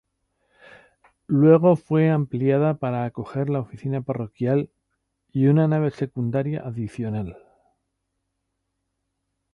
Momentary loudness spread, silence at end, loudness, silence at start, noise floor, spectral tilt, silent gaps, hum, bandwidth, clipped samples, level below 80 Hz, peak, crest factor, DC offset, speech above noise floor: 13 LU; 2.2 s; -22 LUFS; 1.3 s; -77 dBFS; -10.5 dB/octave; none; none; 5 kHz; under 0.1%; -58 dBFS; -4 dBFS; 20 dB; under 0.1%; 56 dB